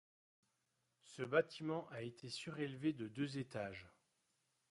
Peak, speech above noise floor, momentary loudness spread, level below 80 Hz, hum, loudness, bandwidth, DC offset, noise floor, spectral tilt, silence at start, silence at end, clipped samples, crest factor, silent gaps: -22 dBFS; 42 dB; 12 LU; -80 dBFS; none; -44 LUFS; 11.5 kHz; under 0.1%; -85 dBFS; -6 dB/octave; 1.05 s; 0.8 s; under 0.1%; 24 dB; none